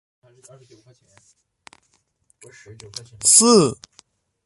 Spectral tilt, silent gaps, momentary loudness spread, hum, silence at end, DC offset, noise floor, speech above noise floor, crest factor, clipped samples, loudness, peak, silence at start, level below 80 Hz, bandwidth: -3 dB/octave; none; 26 LU; none; 0.75 s; under 0.1%; -66 dBFS; 46 dB; 22 dB; under 0.1%; -14 LUFS; 0 dBFS; 3.2 s; -62 dBFS; 12 kHz